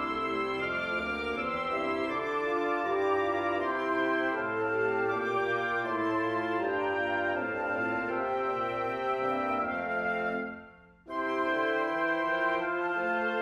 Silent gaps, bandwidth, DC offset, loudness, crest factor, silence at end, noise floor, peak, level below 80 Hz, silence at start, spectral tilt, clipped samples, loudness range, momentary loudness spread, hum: none; 11.5 kHz; under 0.1%; -30 LUFS; 14 dB; 0 s; -53 dBFS; -16 dBFS; -62 dBFS; 0 s; -6 dB/octave; under 0.1%; 2 LU; 3 LU; none